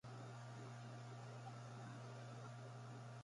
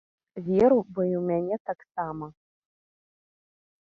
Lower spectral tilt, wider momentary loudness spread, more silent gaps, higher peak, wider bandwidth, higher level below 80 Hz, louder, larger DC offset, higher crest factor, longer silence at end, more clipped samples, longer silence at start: second, -6 dB/octave vs -10 dB/octave; second, 1 LU vs 18 LU; second, none vs 1.60-1.65 s; second, -42 dBFS vs -8 dBFS; first, 11.5 kHz vs 6.8 kHz; second, -86 dBFS vs -62 dBFS; second, -55 LUFS vs -26 LUFS; neither; second, 12 dB vs 20 dB; second, 0 s vs 1.5 s; neither; second, 0.05 s vs 0.35 s